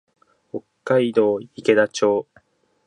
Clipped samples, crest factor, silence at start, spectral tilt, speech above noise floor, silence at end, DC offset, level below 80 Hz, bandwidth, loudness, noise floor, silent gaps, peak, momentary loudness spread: under 0.1%; 20 dB; 0.55 s; -5 dB/octave; 40 dB; 0.65 s; under 0.1%; -70 dBFS; 10.5 kHz; -20 LUFS; -58 dBFS; none; -2 dBFS; 18 LU